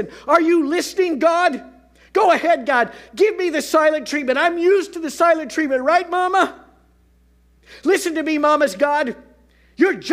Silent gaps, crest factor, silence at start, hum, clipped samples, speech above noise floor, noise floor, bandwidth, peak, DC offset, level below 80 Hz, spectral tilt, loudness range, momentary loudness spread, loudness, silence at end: none; 18 dB; 0 s; none; under 0.1%; 37 dB; -55 dBFS; 16 kHz; 0 dBFS; under 0.1%; -58 dBFS; -3 dB/octave; 3 LU; 6 LU; -18 LUFS; 0 s